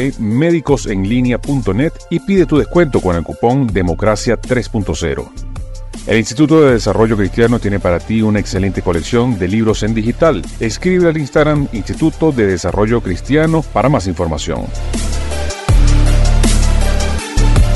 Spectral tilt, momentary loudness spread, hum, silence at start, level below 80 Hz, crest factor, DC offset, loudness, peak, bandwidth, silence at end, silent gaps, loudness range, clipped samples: -6 dB/octave; 8 LU; none; 0 s; -18 dBFS; 12 dB; under 0.1%; -14 LUFS; 0 dBFS; 12 kHz; 0 s; none; 3 LU; under 0.1%